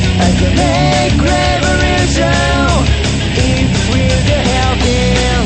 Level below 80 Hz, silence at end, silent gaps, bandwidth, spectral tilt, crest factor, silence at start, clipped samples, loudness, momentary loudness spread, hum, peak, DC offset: -18 dBFS; 0 s; none; 8.8 kHz; -5 dB/octave; 12 dB; 0 s; under 0.1%; -12 LUFS; 2 LU; none; 0 dBFS; under 0.1%